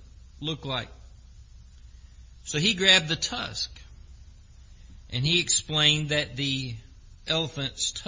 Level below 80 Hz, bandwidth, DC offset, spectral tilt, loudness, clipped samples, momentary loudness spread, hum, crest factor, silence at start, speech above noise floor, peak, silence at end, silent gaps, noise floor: -48 dBFS; 7.8 kHz; under 0.1%; -2.5 dB/octave; -24 LUFS; under 0.1%; 16 LU; none; 24 dB; 0 s; 23 dB; -6 dBFS; 0 s; none; -49 dBFS